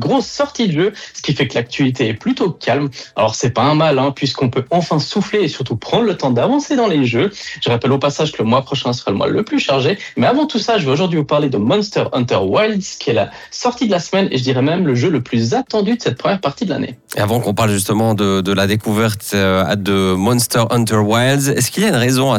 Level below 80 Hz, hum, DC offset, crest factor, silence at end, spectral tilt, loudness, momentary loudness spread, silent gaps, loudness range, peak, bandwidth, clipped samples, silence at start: -54 dBFS; none; under 0.1%; 12 dB; 0 s; -5 dB/octave; -16 LUFS; 4 LU; none; 2 LU; -4 dBFS; 17 kHz; under 0.1%; 0 s